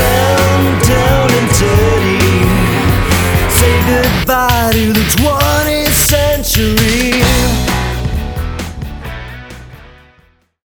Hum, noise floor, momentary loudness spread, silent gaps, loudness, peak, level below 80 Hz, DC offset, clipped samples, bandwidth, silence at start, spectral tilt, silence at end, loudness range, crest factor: none; -50 dBFS; 12 LU; none; -11 LUFS; 0 dBFS; -20 dBFS; under 0.1%; under 0.1%; over 20 kHz; 0 s; -4.5 dB/octave; 0.85 s; 5 LU; 12 dB